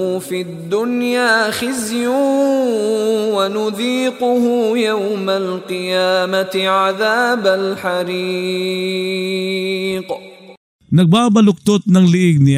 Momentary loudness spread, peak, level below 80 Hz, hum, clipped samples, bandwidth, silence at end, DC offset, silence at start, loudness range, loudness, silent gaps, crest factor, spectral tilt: 8 LU; -2 dBFS; -58 dBFS; none; under 0.1%; 16 kHz; 0 s; under 0.1%; 0 s; 3 LU; -16 LUFS; 10.57-10.79 s; 14 dB; -5.5 dB/octave